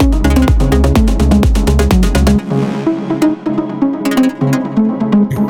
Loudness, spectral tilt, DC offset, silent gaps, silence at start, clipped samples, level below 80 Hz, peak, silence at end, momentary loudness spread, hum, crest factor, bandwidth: -13 LUFS; -7 dB/octave; under 0.1%; none; 0 s; under 0.1%; -16 dBFS; 0 dBFS; 0 s; 5 LU; none; 10 dB; 18 kHz